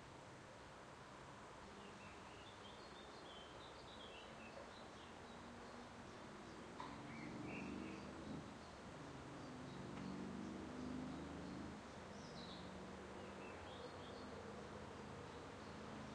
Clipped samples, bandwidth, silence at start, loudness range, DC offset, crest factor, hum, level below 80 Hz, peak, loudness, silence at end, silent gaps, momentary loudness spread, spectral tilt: under 0.1%; 10.5 kHz; 0 s; 5 LU; under 0.1%; 16 dB; none; -70 dBFS; -38 dBFS; -54 LUFS; 0 s; none; 7 LU; -5 dB/octave